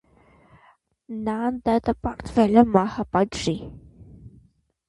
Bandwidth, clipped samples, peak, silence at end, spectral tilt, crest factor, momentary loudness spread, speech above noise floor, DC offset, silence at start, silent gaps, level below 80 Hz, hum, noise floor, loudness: 11 kHz; under 0.1%; -2 dBFS; 0.6 s; -6.5 dB/octave; 22 dB; 14 LU; 38 dB; under 0.1%; 1.1 s; none; -46 dBFS; none; -60 dBFS; -22 LUFS